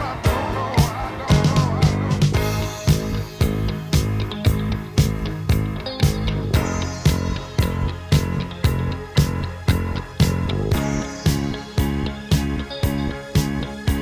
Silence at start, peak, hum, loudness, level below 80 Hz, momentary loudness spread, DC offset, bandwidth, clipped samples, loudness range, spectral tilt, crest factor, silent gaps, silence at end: 0 s; -2 dBFS; none; -22 LUFS; -28 dBFS; 6 LU; under 0.1%; 16 kHz; under 0.1%; 2 LU; -6 dB/octave; 18 dB; none; 0 s